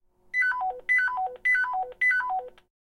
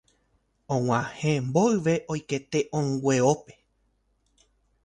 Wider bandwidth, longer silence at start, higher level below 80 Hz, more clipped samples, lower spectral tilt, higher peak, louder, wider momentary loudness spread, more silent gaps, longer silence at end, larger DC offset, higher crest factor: about the same, 11 kHz vs 10.5 kHz; second, 0.35 s vs 0.7 s; about the same, -64 dBFS vs -60 dBFS; neither; second, -1 dB/octave vs -6 dB/octave; second, -16 dBFS vs -8 dBFS; about the same, -25 LUFS vs -26 LUFS; about the same, 7 LU vs 8 LU; neither; second, 0.5 s vs 1.35 s; neither; second, 12 dB vs 20 dB